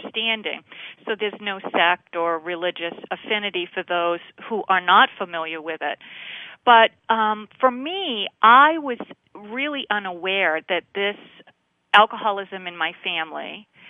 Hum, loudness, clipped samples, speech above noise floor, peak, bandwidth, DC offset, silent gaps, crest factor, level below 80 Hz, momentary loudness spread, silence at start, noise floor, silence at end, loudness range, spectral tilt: none; -21 LUFS; under 0.1%; 37 dB; 0 dBFS; 7.2 kHz; under 0.1%; none; 22 dB; -76 dBFS; 18 LU; 0 s; -59 dBFS; 0 s; 6 LU; -5 dB/octave